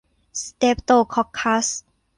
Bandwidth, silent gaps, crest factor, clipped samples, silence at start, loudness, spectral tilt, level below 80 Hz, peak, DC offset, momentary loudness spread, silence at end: 11 kHz; none; 16 dB; under 0.1%; 0.35 s; -20 LUFS; -3 dB/octave; -48 dBFS; -4 dBFS; under 0.1%; 14 LU; 0.4 s